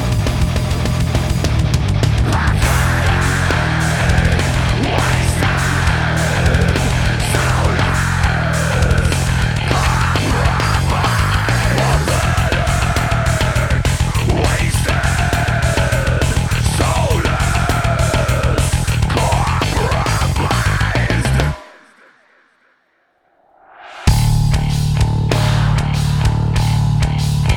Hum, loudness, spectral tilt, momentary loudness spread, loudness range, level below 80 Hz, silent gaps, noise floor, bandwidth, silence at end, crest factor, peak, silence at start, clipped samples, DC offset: none; -16 LUFS; -5 dB/octave; 2 LU; 3 LU; -22 dBFS; none; -60 dBFS; 19 kHz; 0 s; 14 dB; 0 dBFS; 0 s; under 0.1%; under 0.1%